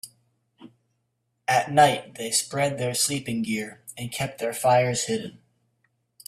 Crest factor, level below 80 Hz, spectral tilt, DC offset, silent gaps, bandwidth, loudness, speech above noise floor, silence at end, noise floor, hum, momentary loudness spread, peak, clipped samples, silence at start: 22 dB; -64 dBFS; -3.5 dB/octave; under 0.1%; none; 16 kHz; -24 LUFS; 51 dB; 0.9 s; -75 dBFS; none; 14 LU; -4 dBFS; under 0.1%; 0.05 s